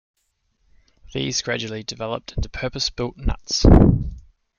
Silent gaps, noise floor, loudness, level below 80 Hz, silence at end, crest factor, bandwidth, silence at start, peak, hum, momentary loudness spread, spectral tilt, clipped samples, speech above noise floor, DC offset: none; -69 dBFS; -21 LUFS; -26 dBFS; 0.4 s; 20 dB; 7.2 kHz; 1.15 s; 0 dBFS; none; 15 LU; -5.5 dB/octave; under 0.1%; 50 dB; under 0.1%